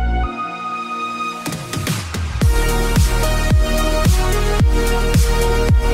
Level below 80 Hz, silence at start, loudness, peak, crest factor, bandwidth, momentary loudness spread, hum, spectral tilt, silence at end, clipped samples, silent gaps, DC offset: -18 dBFS; 0 s; -18 LUFS; -4 dBFS; 12 dB; 16 kHz; 8 LU; none; -5 dB/octave; 0 s; under 0.1%; none; under 0.1%